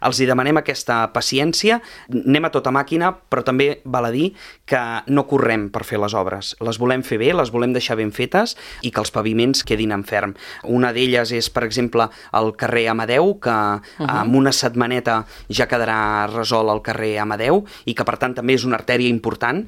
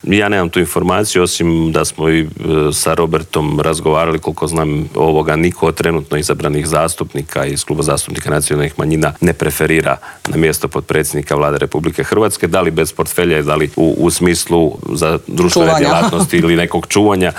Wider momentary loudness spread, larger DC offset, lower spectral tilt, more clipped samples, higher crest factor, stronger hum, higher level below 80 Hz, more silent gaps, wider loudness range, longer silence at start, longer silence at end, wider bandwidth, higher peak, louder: about the same, 6 LU vs 5 LU; neither; about the same, -4.5 dB/octave vs -5 dB/octave; neither; first, 18 dB vs 12 dB; neither; second, -48 dBFS vs -38 dBFS; neither; about the same, 2 LU vs 3 LU; about the same, 0 s vs 0.05 s; about the same, 0 s vs 0 s; about the same, 16.5 kHz vs 17 kHz; about the same, 0 dBFS vs 0 dBFS; second, -19 LUFS vs -14 LUFS